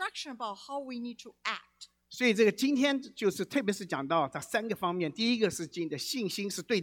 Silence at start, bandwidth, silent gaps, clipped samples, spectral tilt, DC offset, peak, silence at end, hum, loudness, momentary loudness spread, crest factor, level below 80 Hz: 0 s; 18.5 kHz; none; under 0.1%; -4 dB/octave; under 0.1%; -12 dBFS; 0 s; 60 Hz at -65 dBFS; -31 LUFS; 13 LU; 18 dB; -74 dBFS